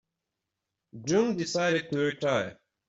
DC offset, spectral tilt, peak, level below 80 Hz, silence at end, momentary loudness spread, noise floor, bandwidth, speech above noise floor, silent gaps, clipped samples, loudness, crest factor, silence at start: under 0.1%; -4.5 dB/octave; -12 dBFS; -68 dBFS; 0.35 s; 7 LU; -86 dBFS; 8 kHz; 58 dB; none; under 0.1%; -28 LUFS; 18 dB; 0.95 s